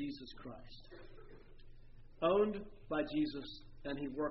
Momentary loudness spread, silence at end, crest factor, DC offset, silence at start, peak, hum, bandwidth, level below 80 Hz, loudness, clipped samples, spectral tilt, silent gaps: 24 LU; 0 s; 18 dB; under 0.1%; 0 s; -22 dBFS; none; 5.8 kHz; -56 dBFS; -38 LUFS; under 0.1%; -4.5 dB/octave; none